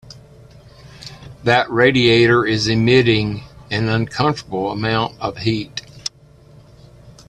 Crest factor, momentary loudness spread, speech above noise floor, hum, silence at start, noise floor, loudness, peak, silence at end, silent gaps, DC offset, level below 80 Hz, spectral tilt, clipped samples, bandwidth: 18 dB; 17 LU; 30 dB; none; 0.05 s; -46 dBFS; -17 LUFS; 0 dBFS; 0.2 s; none; under 0.1%; -46 dBFS; -5.5 dB/octave; under 0.1%; 10.5 kHz